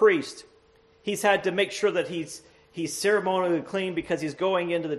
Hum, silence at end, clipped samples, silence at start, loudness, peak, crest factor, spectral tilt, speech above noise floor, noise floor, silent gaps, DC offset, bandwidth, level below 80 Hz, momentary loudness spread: none; 0 s; under 0.1%; 0 s; -26 LUFS; -8 dBFS; 20 dB; -4 dB/octave; 34 dB; -59 dBFS; none; under 0.1%; 13 kHz; -66 dBFS; 15 LU